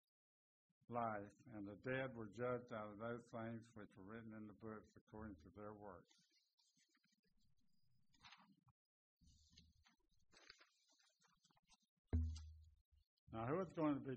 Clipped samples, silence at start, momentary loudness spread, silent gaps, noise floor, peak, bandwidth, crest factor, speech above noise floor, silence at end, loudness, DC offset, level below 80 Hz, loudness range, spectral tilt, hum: under 0.1%; 0.9 s; 20 LU; 5.01-5.07 s, 6.53-6.58 s, 7.19-7.23 s, 8.71-9.17 s, 11.59-11.63 s, 11.89-12.04 s, 12.81-12.92 s, 13.07-13.27 s; -85 dBFS; -30 dBFS; 8 kHz; 22 dB; 35 dB; 0 s; -50 LUFS; under 0.1%; -62 dBFS; 13 LU; -6.5 dB/octave; none